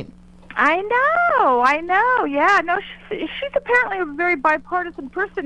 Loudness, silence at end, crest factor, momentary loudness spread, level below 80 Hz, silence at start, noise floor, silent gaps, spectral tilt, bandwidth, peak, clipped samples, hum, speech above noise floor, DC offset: -18 LUFS; 0 s; 18 dB; 10 LU; -50 dBFS; 0 s; -42 dBFS; none; -4.5 dB/octave; 10.5 kHz; -2 dBFS; under 0.1%; none; 23 dB; under 0.1%